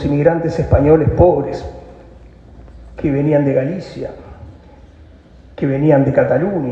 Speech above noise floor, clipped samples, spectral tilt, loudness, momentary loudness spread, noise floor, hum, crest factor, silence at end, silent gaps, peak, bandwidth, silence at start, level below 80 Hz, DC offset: 28 dB; under 0.1%; -9.5 dB/octave; -15 LUFS; 17 LU; -42 dBFS; none; 16 dB; 0 s; none; 0 dBFS; 7.6 kHz; 0 s; -32 dBFS; under 0.1%